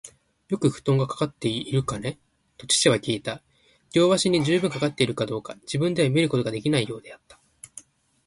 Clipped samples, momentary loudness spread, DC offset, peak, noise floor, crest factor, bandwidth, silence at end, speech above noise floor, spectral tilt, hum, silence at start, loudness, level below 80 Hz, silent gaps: under 0.1%; 14 LU; under 0.1%; -6 dBFS; -49 dBFS; 20 dB; 11.5 kHz; 0.45 s; 26 dB; -4.5 dB/octave; none; 0.05 s; -24 LUFS; -58 dBFS; none